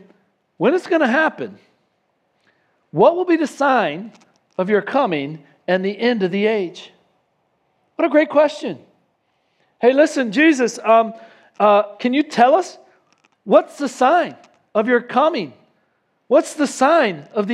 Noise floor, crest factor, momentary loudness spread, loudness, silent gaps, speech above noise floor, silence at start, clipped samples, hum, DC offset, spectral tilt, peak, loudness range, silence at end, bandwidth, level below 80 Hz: -67 dBFS; 18 dB; 15 LU; -17 LUFS; none; 50 dB; 0.6 s; under 0.1%; none; under 0.1%; -5 dB/octave; 0 dBFS; 4 LU; 0 s; 12 kHz; -76 dBFS